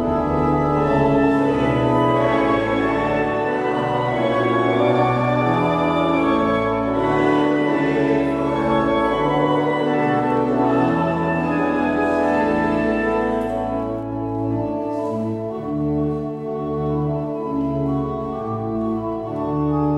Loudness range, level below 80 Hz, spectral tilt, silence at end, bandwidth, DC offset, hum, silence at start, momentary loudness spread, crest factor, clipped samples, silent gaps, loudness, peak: 5 LU; -40 dBFS; -8 dB/octave; 0 s; 9.6 kHz; under 0.1%; none; 0 s; 7 LU; 14 dB; under 0.1%; none; -20 LUFS; -6 dBFS